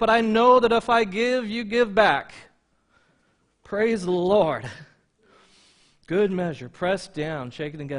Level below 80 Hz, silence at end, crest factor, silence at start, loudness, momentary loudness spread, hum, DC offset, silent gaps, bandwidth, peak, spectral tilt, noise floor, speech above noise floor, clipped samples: -56 dBFS; 0 s; 20 dB; 0 s; -22 LUFS; 14 LU; none; under 0.1%; none; 10.5 kHz; -4 dBFS; -5.5 dB/octave; -67 dBFS; 45 dB; under 0.1%